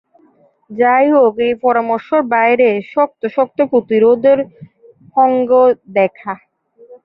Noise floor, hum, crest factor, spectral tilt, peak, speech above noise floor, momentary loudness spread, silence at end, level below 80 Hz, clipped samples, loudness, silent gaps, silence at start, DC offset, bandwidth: -52 dBFS; none; 12 dB; -9 dB/octave; -2 dBFS; 39 dB; 8 LU; 0.1 s; -62 dBFS; under 0.1%; -13 LUFS; none; 0.7 s; under 0.1%; 5.2 kHz